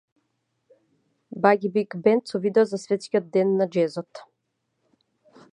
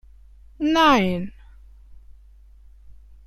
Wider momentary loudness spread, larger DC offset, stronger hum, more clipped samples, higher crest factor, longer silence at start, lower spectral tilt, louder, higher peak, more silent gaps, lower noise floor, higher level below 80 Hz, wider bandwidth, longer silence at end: second, 7 LU vs 15 LU; neither; neither; neither; about the same, 22 dB vs 20 dB; first, 1.35 s vs 0.6 s; first, -6.5 dB/octave vs -5 dB/octave; second, -23 LUFS vs -19 LUFS; first, -2 dBFS vs -6 dBFS; neither; first, -76 dBFS vs -48 dBFS; second, -78 dBFS vs -46 dBFS; second, 10.5 kHz vs 14 kHz; first, 1.35 s vs 0.35 s